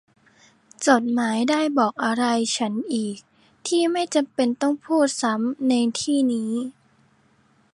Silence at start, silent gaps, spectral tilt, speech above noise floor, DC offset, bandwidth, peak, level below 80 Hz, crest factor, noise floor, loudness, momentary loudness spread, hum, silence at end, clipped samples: 0.8 s; none; -3.5 dB/octave; 39 dB; under 0.1%; 11.5 kHz; -2 dBFS; -72 dBFS; 20 dB; -61 dBFS; -22 LUFS; 7 LU; none; 1 s; under 0.1%